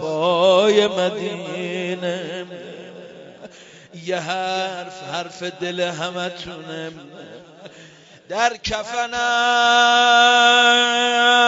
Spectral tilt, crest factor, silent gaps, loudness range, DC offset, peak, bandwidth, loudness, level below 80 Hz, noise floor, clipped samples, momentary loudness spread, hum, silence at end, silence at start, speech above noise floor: -2.5 dB/octave; 18 dB; none; 13 LU; under 0.1%; -2 dBFS; 8 kHz; -17 LUFS; -56 dBFS; -45 dBFS; under 0.1%; 20 LU; none; 0 s; 0 s; 27 dB